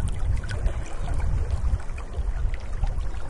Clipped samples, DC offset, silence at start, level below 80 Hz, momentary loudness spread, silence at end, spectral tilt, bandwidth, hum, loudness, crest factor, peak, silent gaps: under 0.1%; under 0.1%; 0 s; -26 dBFS; 4 LU; 0 s; -6.5 dB/octave; 11 kHz; none; -30 LUFS; 14 dB; -10 dBFS; none